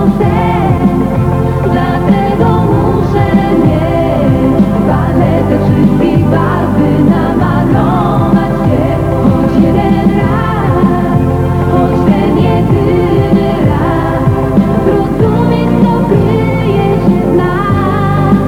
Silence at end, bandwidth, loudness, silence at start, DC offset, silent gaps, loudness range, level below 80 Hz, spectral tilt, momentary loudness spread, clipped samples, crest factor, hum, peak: 0 s; 15.5 kHz; -10 LUFS; 0 s; under 0.1%; none; 1 LU; -24 dBFS; -9 dB/octave; 2 LU; 0.2%; 8 dB; 50 Hz at -20 dBFS; 0 dBFS